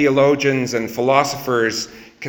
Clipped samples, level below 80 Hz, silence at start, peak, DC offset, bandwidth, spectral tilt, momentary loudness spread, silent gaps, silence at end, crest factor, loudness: under 0.1%; -54 dBFS; 0 s; 0 dBFS; under 0.1%; over 20 kHz; -4.5 dB/octave; 8 LU; none; 0 s; 18 dB; -18 LUFS